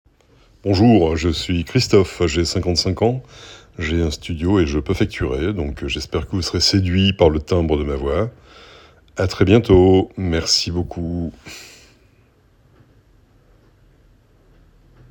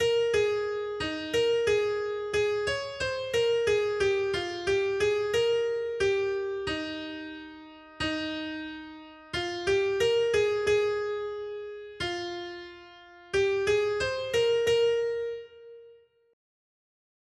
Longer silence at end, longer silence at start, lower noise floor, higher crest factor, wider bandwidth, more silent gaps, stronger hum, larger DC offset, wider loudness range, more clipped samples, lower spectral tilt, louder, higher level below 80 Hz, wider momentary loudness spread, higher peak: first, 3.4 s vs 1.4 s; first, 0.65 s vs 0 s; about the same, -55 dBFS vs -56 dBFS; about the same, 18 dB vs 14 dB; first, 17.5 kHz vs 12.5 kHz; neither; neither; neither; about the same, 6 LU vs 4 LU; neither; first, -5.5 dB/octave vs -4 dB/octave; first, -18 LUFS vs -28 LUFS; first, -34 dBFS vs -56 dBFS; about the same, 14 LU vs 15 LU; first, 0 dBFS vs -14 dBFS